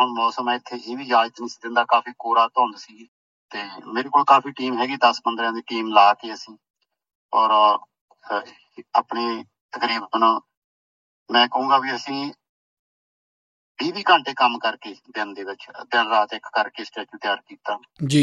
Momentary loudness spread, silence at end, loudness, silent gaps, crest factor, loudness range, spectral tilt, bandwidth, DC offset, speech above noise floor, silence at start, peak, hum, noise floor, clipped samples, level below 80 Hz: 16 LU; 0 s; -21 LUFS; 3.08-3.49 s, 6.70-6.74 s, 7.15-7.29 s, 8.01-8.08 s, 9.61-9.69 s, 10.57-11.26 s, 12.49-13.75 s; 20 dB; 4 LU; -4.5 dB/octave; 11 kHz; under 0.1%; over 69 dB; 0 s; -2 dBFS; none; under -90 dBFS; under 0.1%; -74 dBFS